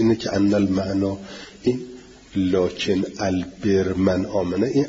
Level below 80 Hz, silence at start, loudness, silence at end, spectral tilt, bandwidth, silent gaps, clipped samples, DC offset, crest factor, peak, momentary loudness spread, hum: -50 dBFS; 0 s; -22 LUFS; 0 s; -6.5 dB/octave; 7.8 kHz; none; under 0.1%; under 0.1%; 14 dB; -6 dBFS; 9 LU; none